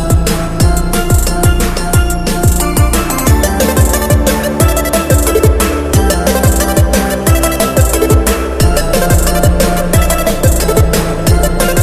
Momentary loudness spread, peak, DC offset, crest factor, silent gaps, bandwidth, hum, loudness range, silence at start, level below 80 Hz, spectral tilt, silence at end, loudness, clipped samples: 2 LU; 0 dBFS; 0.3%; 10 dB; none; 14.5 kHz; none; 1 LU; 0 s; -14 dBFS; -5 dB/octave; 0 s; -11 LUFS; under 0.1%